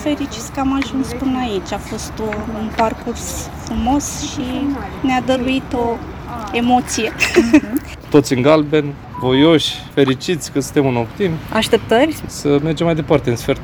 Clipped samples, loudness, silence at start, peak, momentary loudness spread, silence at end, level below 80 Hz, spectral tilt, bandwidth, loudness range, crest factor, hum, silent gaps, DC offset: under 0.1%; -17 LUFS; 0 s; 0 dBFS; 11 LU; 0 s; -36 dBFS; -5 dB/octave; over 20 kHz; 6 LU; 16 dB; none; none; under 0.1%